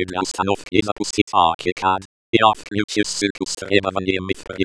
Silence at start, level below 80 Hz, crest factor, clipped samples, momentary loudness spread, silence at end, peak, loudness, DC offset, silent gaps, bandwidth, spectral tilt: 0 s; -50 dBFS; 20 dB; under 0.1%; 7 LU; 0 s; 0 dBFS; -20 LUFS; 0.2%; 0.92-0.96 s, 1.22-1.27 s, 1.54-1.59 s, 1.72-1.76 s, 2.05-2.33 s, 2.84-2.88 s, 3.30-3.35 s; 11 kHz; -4 dB/octave